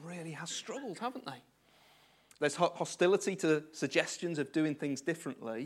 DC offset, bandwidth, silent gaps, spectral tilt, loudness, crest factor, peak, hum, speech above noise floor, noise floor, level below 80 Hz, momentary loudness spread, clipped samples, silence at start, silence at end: under 0.1%; 15.5 kHz; none; -4.5 dB/octave; -34 LUFS; 24 dB; -12 dBFS; none; 31 dB; -65 dBFS; -84 dBFS; 12 LU; under 0.1%; 0 s; 0 s